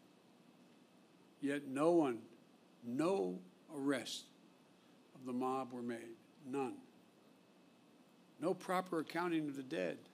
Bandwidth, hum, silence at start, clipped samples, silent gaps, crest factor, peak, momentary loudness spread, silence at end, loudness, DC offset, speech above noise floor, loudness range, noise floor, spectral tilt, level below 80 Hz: 15.5 kHz; none; 1.4 s; under 0.1%; none; 20 dB; -22 dBFS; 17 LU; 0.05 s; -40 LUFS; under 0.1%; 28 dB; 7 LU; -67 dBFS; -5.5 dB/octave; under -90 dBFS